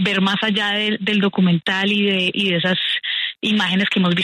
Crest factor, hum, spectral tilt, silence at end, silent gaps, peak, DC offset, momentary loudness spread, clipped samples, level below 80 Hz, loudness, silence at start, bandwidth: 12 dB; none; -5.5 dB/octave; 0 s; none; -6 dBFS; under 0.1%; 2 LU; under 0.1%; -62 dBFS; -18 LUFS; 0 s; 10.5 kHz